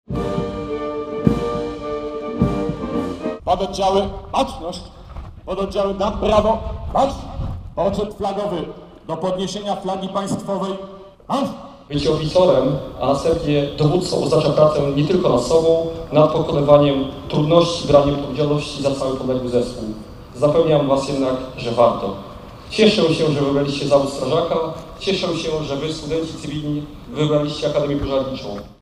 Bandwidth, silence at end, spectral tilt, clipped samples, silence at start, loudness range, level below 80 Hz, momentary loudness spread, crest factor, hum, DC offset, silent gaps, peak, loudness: 12 kHz; 0.1 s; -6.5 dB/octave; under 0.1%; 0.1 s; 7 LU; -38 dBFS; 13 LU; 20 dB; none; under 0.1%; none; 0 dBFS; -19 LUFS